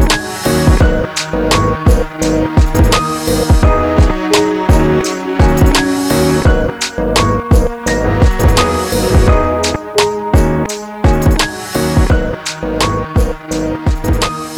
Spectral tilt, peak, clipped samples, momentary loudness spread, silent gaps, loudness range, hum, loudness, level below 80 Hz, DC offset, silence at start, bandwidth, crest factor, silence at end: -5.5 dB/octave; -2 dBFS; under 0.1%; 6 LU; none; 3 LU; none; -13 LUFS; -16 dBFS; under 0.1%; 0 s; 19.5 kHz; 10 dB; 0 s